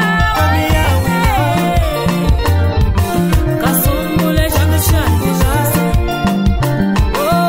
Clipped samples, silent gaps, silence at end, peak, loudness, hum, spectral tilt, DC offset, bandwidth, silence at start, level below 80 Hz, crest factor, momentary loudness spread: under 0.1%; none; 0 s; -2 dBFS; -14 LUFS; none; -5.5 dB/octave; under 0.1%; 16.5 kHz; 0 s; -20 dBFS; 10 dB; 2 LU